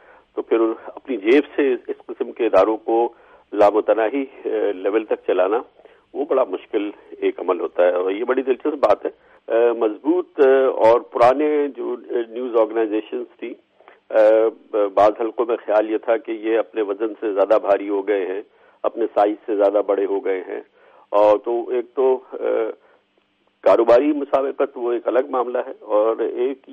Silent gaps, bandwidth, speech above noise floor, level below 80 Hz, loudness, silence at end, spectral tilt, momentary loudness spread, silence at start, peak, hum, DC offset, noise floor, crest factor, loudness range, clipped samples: none; 7.2 kHz; 44 dB; -66 dBFS; -20 LUFS; 0 s; -6.5 dB/octave; 11 LU; 0.35 s; -4 dBFS; none; under 0.1%; -63 dBFS; 16 dB; 4 LU; under 0.1%